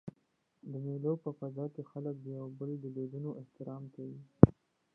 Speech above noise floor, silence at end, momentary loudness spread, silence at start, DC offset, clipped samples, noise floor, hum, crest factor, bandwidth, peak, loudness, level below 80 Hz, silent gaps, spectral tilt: 36 dB; 0.45 s; 21 LU; 0.05 s; under 0.1%; under 0.1%; -76 dBFS; none; 34 dB; 2.6 kHz; -2 dBFS; -34 LUFS; -54 dBFS; none; -13.5 dB/octave